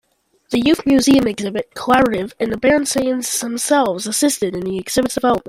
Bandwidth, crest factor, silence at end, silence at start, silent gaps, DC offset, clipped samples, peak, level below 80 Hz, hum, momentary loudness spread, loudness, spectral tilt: 16 kHz; 16 dB; 0 s; 0.5 s; none; under 0.1%; under 0.1%; -2 dBFS; -46 dBFS; none; 8 LU; -17 LUFS; -3.5 dB/octave